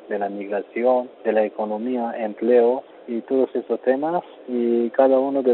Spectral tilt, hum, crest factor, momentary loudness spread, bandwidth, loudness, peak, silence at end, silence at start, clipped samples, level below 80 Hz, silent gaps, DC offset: -5.5 dB/octave; none; 18 dB; 10 LU; 4.2 kHz; -22 LUFS; -4 dBFS; 0 s; 0.05 s; under 0.1%; -74 dBFS; none; under 0.1%